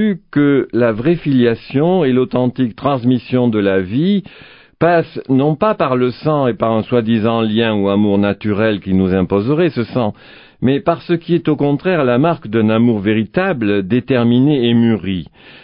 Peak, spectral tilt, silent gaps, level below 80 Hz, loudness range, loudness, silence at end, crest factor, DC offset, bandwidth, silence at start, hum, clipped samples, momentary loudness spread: 0 dBFS; -13 dB/octave; none; -44 dBFS; 2 LU; -15 LUFS; 0.4 s; 14 dB; under 0.1%; 5.4 kHz; 0 s; none; under 0.1%; 4 LU